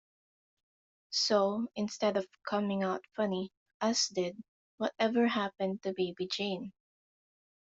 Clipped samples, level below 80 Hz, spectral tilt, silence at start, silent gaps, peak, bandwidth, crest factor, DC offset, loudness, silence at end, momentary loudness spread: under 0.1%; -78 dBFS; -4 dB/octave; 1.1 s; 3.57-3.66 s, 3.74-3.80 s, 4.48-4.78 s; -14 dBFS; 8 kHz; 20 dB; under 0.1%; -33 LUFS; 1 s; 9 LU